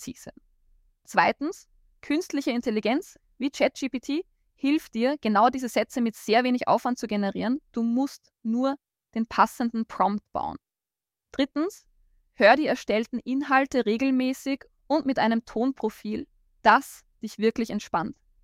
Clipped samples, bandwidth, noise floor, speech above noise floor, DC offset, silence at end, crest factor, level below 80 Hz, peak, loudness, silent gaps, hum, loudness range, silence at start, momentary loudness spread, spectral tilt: under 0.1%; 15.5 kHz; under -90 dBFS; over 65 dB; under 0.1%; 0.3 s; 20 dB; -62 dBFS; -6 dBFS; -26 LUFS; none; none; 4 LU; 0 s; 12 LU; -5 dB/octave